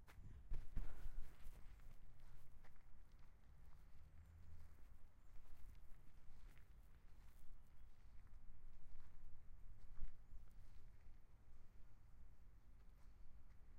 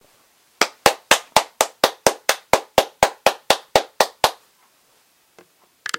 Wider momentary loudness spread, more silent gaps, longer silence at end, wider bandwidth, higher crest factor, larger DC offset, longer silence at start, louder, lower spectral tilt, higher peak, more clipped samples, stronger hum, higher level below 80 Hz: first, 11 LU vs 6 LU; neither; about the same, 0 s vs 0 s; second, 3 kHz vs over 20 kHz; about the same, 18 dB vs 22 dB; neither; second, 0 s vs 0.6 s; second, -64 LUFS vs -19 LUFS; first, -6 dB/octave vs -1 dB/octave; second, -32 dBFS vs 0 dBFS; neither; neither; second, -56 dBFS vs -50 dBFS